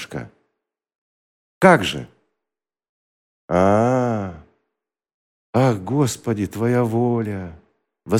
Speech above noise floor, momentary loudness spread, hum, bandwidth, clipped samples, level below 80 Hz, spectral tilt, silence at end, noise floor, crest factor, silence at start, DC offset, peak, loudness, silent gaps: 70 dB; 17 LU; none; 16 kHz; under 0.1%; -54 dBFS; -6.5 dB/octave; 0 s; -87 dBFS; 22 dB; 0 s; under 0.1%; 0 dBFS; -19 LUFS; 0.98-1.61 s, 2.89-3.48 s, 5.14-5.53 s